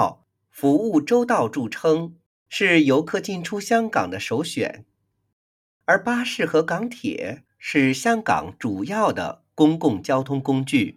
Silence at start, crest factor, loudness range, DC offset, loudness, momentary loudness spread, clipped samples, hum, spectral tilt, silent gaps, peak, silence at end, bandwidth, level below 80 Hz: 0 s; 18 dB; 4 LU; under 0.1%; -22 LUFS; 10 LU; under 0.1%; none; -5.5 dB/octave; 2.26-2.46 s, 5.33-5.80 s; -4 dBFS; 0.05 s; 15.5 kHz; -62 dBFS